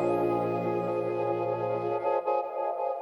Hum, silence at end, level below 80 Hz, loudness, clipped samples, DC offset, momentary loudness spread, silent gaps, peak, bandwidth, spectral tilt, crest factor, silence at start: none; 0 s; -68 dBFS; -29 LUFS; under 0.1%; under 0.1%; 3 LU; none; -16 dBFS; 12 kHz; -8.5 dB/octave; 14 dB; 0 s